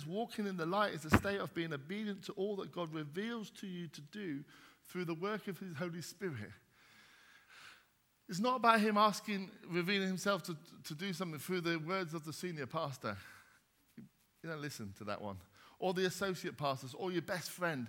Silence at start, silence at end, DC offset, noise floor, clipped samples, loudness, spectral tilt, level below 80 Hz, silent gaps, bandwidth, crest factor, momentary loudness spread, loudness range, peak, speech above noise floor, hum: 0 s; 0 s; under 0.1%; -73 dBFS; under 0.1%; -38 LUFS; -5 dB/octave; -64 dBFS; none; 17.5 kHz; 28 dB; 15 LU; 10 LU; -12 dBFS; 34 dB; none